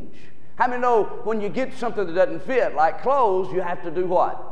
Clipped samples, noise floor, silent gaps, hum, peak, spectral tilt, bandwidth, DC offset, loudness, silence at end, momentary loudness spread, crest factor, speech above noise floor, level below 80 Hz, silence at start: under 0.1%; -49 dBFS; none; none; -4 dBFS; -6.5 dB/octave; 9.6 kHz; 5%; -23 LUFS; 0 s; 7 LU; 18 dB; 27 dB; -58 dBFS; 0 s